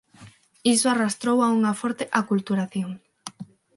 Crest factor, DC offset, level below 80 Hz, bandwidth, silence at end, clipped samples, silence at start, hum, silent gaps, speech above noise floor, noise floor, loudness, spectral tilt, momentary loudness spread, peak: 20 dB; under 0.1%; -70 dBFS; 11.5 kHz; 0.3 s; under 0.1%; 0.2 s; none; none; 28 dB; -50 dBFS; -23 LUFS; -4 dB/octave; 19 LU; -6 dBFS